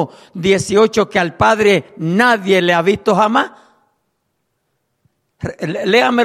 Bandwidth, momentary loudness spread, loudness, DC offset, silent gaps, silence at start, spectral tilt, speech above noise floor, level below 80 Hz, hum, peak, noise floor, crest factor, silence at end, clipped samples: 14.5 kHz; 11 LU; -14 LUFS; under 0.1%; none; 0 s; -5 dB/octave; 55 dB; -50 dBFS; none; 0 dBFS; -69 dBFS; 14 dB; 0 s; under 0.1%